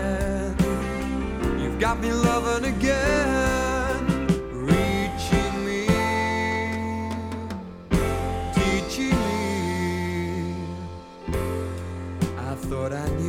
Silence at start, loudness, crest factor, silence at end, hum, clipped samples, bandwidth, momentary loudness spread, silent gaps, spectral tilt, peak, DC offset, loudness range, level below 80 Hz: 0 s; -25 LUFS; 20 dB; 0 s; none; under 0.1%; 16.5 kHz; 9 LU; none; -5.5 dB/octave; -4 dBFS; under 0.1%; 5 LU; -34 dBFS